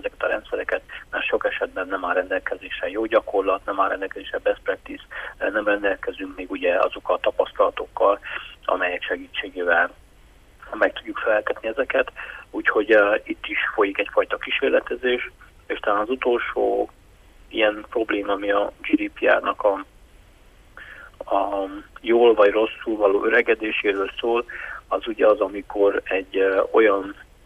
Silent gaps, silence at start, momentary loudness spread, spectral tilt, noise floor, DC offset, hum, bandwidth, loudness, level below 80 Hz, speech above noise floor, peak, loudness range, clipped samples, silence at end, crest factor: none; 0.05 s; 12 LU; -5 dB/octave; -51 dBFS; under 0.1%; none; 11 kHz; -22 LUFS; -52 dBFS; 29 dB; -4 dBFS; 4 LU; under 0.1%; 0.25 s; 18 dB